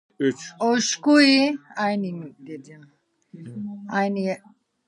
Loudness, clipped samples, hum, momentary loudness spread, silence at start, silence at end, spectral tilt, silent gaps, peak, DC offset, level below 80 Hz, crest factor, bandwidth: -21 LUFS; under 0.1%; none; 23 LU; 0.2 s; 0.5 s; -4 dB/octave; none; -4 dBFS; under 0.1%; -78 dBFS; 20 dB; 11 kHz